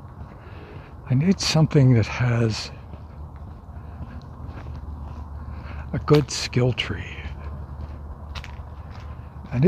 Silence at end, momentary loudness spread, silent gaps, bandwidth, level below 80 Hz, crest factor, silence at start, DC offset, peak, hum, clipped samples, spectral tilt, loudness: 0 s; 21 LU; none; 11.5 kHz; -40 dBFS; 20 dB; 0 s; under 0.1%; -4 dBFS; none; under 0.1%; -6 dB/octave; -22 LUFS